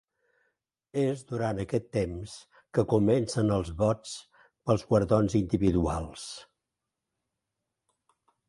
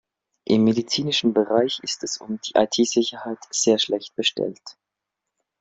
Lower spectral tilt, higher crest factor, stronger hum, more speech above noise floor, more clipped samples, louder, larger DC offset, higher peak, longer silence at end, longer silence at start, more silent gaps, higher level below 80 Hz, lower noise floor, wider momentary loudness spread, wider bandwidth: first, -7 dB/octave vs -3.5 dB/octave; about the same, 20 dB vs 20 dB; neither; about the same, 59 dB vs 61 dB; neither; second, -28 LUFS vs -22 LUFS; neither; second, -10 dBFS vs -4 dBFS; first, 2.05 s vs 0.9 s; first, 0.95 s vs 0.5 s; neither; first, -48 dBFS vs -64 dBFS; about the same, -86 dBFS vs -84 dBFS; first, 16 LU vs 10 LU; first, 11.5 kHz vs 8.2 kHz